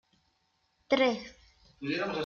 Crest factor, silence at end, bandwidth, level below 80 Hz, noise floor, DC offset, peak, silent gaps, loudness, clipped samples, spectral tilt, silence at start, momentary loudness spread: 20 dB; 0 s; 7 kHz; -66 dBFS; -75 dBFS; under 0.1%; -14 dBFS; none; -31 LUFS; under 0.1%; -5 dB/octave; 0.9 s; 14 LU